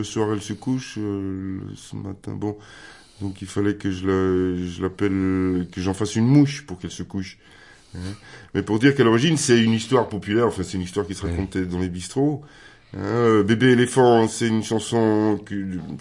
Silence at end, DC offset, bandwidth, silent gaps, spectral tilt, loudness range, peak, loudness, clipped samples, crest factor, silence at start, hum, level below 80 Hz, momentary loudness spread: 0 s; under 0.1%; 11.5 kHz; none; -6 dB/octave; 8 LU; -4 dBFS; -22 LUFS; under 0.1%; 18 dB; 0 s; none; -54 dBFS; 17 LU